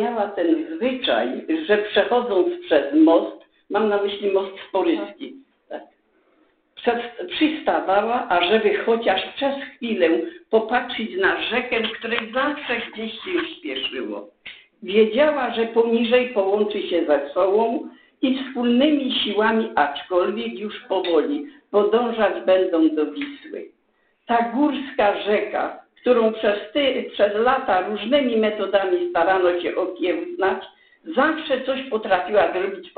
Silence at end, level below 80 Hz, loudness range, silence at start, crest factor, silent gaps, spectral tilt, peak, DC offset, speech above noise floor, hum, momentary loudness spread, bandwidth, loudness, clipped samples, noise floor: 0.1 s; -60 dBFS; 4 LU; 0 s; 18 dB; none; -9 dB/octave; -4 dBFS; under 0.1%; 45 dB; none; 10 LU; 4.7 kHz; -21 LUFS; under 0.1%; -65 dBFS